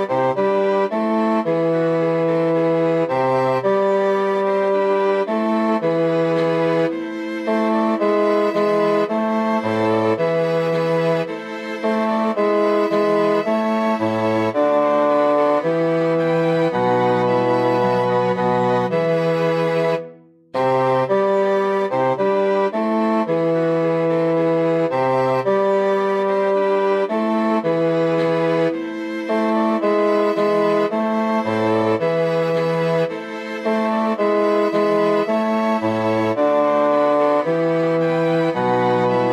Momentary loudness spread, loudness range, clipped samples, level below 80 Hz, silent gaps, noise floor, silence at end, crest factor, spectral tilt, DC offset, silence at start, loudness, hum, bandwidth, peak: 3 LU; 2 LU; under 0.1%; -66 dBFS; none; -42 dBFS; 0 s; 12 dB; -7.5 dB/octave; under 0.1%; 0 s; -18 LUFS; none; 12 kHz; -6 dBFS